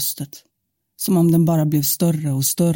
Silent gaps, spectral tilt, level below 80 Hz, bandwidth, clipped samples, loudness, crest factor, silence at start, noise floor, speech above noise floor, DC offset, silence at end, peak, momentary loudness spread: none; -6 dB/octave; -58 dBFS; 17 kHz; under 0.1%; -18 LUFS; 12 dB; 0 s; -75 dBFS; 57 dB; under 0.1%; 0 s; -6 dBFS; 11 LU